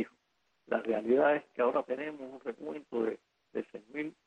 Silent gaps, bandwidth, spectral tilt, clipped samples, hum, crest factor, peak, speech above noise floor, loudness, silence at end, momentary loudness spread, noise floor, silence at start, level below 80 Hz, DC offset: none; 9 kHz; -7 dB/octave; under 0.1%; none; 18 dB; -16 dBFS; 45 dB; -34 LUFS; 0.15 s; 15 LU; -77 dBFS; 0 s; -78 dBFS; under 0.1%